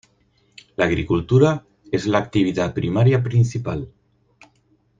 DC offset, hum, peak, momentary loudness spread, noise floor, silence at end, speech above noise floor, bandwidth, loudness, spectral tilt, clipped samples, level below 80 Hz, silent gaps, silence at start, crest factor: under 0.1%; none; -2 dBFS; 12 LU; -62 dBFS; 1.1 s; 43 dB; 7.6 kHz; -20 LUFS; -7.5 dB/octave; under 0.1%; -46 dBFS; none; 0.8 s; 18 dB